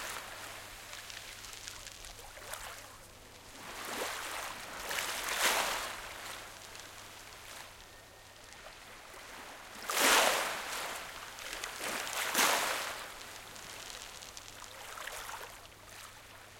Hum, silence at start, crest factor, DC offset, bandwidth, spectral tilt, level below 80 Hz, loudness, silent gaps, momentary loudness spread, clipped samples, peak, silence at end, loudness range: none; 0 s; 26 dB; under 0.1%; 17 kHz; 0 dB/octave; -62 dBFS; -35 LUFS; none; 21 LU; under 0.1%; -12 dBFS; 0 s; 14 LU